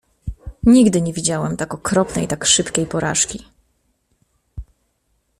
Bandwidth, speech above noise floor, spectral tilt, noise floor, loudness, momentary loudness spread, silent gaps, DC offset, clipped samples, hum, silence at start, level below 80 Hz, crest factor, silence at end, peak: 14.5 kHz; 50 dB; -4 dB/octave; -67 dBFS; -17 LUFS; 22 LU; none; under 0.1%; under 0.1%; none; 0.25 s; -40 dBFS; 18 dB; 0.75 s; -2 dBFS